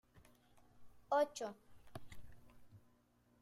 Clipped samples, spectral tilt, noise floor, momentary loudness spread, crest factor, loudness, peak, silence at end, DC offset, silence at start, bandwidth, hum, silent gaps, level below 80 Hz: under 0.1%; -4 dB/octave; -74 dBFS; 25 LU; 20 dB; -40 LUFS; -26 dBFS; 0.65 s; under 0.1%; 0.15 s; 15.5 kHz; none; none; -70 dBFS